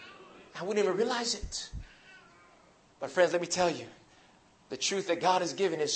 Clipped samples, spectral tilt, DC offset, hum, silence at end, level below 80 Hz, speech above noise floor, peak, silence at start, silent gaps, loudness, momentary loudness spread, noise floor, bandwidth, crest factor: under 0.1%; -3 dB/octave; under 0.1%; none; 0 s; -54 dBFS; 31 dB; -12 dBFS; 0 s; none; -30 LUFS; 20 LU; -61 dBFS; 8.8 kHz; 20 dB